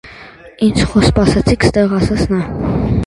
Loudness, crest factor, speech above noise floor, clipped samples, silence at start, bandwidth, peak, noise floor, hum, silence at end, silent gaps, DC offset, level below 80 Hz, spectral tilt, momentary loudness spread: -14 LUFS; 14 dB; 24 dB; under 0.1%; 0.05 s; 11.5 kHz; 0 dBFS; -36 dBFS; none; 0 s; none; under 0.1%; -26 dBFS; -6.5 dB/octave; 6 LU